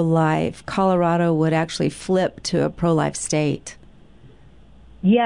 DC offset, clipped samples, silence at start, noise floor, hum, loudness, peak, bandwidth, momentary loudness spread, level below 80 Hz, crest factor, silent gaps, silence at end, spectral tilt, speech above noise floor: 0.3%; under 0.1%; 0 s; -48 dBFS; none; -21 LUFS; -8 dBFS; 11 kHz; 6 LU; -48 dBFS; 14 dB; none; 0 s; -6 dB/octave; 28 dB